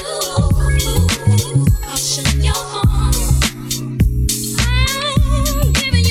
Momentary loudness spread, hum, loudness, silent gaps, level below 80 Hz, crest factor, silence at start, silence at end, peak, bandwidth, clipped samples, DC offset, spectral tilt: 3 LU; none; -16 LUFS; none; -18 dBFS; 14 dB; 0 s; 0 s; -2 dBFS; 17 kHz; under 0.1%; under 0.1%; -4 dB/octave